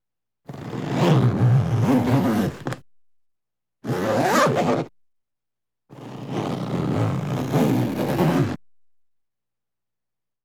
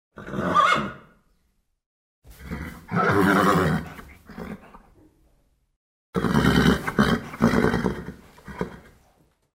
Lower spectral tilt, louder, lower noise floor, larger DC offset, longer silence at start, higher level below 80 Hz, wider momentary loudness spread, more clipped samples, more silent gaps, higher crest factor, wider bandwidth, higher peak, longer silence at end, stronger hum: about the same, -7 dB/octave vs -6 dB/octave; about the same, -22 LUFS vs -22 LUFS; first, -90 dBFS vs -69 dBFS; neither; first, 0.5 s vs 0.2 s; second, -54 dBFS vs -42 dBFS; second, 18 LU vs 21 LU; neither; second, none vs 1.86-2.22 s, 5.76-6.13 s; about the same, 18 dB vs 22 dB; about the same, 17.5 kHz vs 16 kHz; about the same, -6 dBFS vs -4 dBFS; first, 1.9 s vs 0.75 s; first, 60 Hz at -45 dBFS vs none